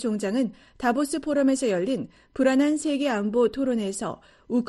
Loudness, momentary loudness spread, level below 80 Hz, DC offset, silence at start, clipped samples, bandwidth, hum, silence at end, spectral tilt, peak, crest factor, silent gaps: -25 LUFS; 9 LU; -58 dBFS; under 0.1%; 0 s; under 0.1%; 12.5 kHz; none; 0 s; -5 dB/octave; -10 dBFS; 16 dB; none